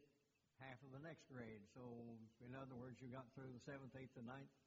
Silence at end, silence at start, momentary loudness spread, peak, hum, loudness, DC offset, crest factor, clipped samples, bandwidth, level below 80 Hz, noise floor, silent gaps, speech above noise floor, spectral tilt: 0.05 s; 0 s; 4 LU; -42 dBFS; none; -59 LUFS; under 0.1%; 16 dB; under 0.1%; 7.4 kHz; -86 dBFS; -84 dBFS; none; 26 dB; -6.5 dB/octave